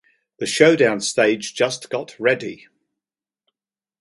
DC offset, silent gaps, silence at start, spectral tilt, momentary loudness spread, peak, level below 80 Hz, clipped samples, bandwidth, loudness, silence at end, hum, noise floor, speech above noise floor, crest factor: under 0.1%; none; 0.4 s; -3.5 dB/octave; 14 LU; 0 dBFS; -68 dBFS; under 0.1%; 11.5 kHz; -19 LUFS; 1.5 s; none; -89 dBFS; 70 dB; 22 dB